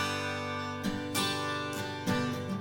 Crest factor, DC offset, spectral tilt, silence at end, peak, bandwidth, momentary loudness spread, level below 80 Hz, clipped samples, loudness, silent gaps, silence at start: 16 dB; under 0.1%; -4 dB/octave; 0 s; -16 dBFS; 17 kHz; 4 LU; -58 dBFS; under 0.1%; -33 LUFS; none; 0 s